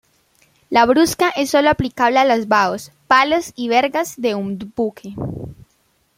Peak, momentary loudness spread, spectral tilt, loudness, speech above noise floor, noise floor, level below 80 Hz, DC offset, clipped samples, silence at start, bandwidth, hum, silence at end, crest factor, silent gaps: 0 dBFS; 14 LU; -4.5 dB/octave; -17 LUFS; 45 dB; -62 dBFS; -48 dBFS; under 0.1%; under 0.1%; 0.7 s; 16.5 kHz; none; 0.65 s; 18 dB; none